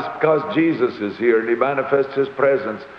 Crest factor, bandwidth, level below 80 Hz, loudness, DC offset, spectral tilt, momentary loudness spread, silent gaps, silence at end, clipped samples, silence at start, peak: 16 dB; 6 kHz; -64 dBFS; -19 LUFS; under 0.1%; -8.5 dB/octave; 4 LU; none; 0 s; under 0.1%; 0 s; -4 dBFS